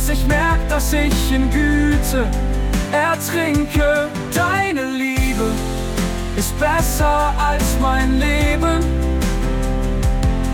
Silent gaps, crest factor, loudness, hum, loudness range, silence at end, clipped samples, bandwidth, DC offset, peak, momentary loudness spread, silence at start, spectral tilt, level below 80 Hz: none; 10 dB; -18 LUFS; none; 1 LU; 0 s; under 0.1%; 18.5 kHz; under 0.1%; -6 dBFS; 5 LU; 0 s; -5 dB/octave; -20 dBFS